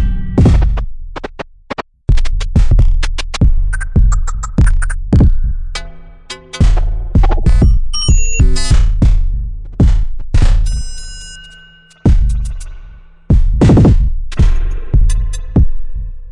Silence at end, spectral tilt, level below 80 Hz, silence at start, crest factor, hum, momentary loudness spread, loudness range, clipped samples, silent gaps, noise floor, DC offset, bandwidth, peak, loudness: 0 s; -6 dB/octave; -12 dBFS; 0 s; 10 dB; none; 16 LU; 4 LU; under 0.1%; none; -41 dBFS; under 0.1%; 10.5 kHz; 0 dBFS; -14 LUFS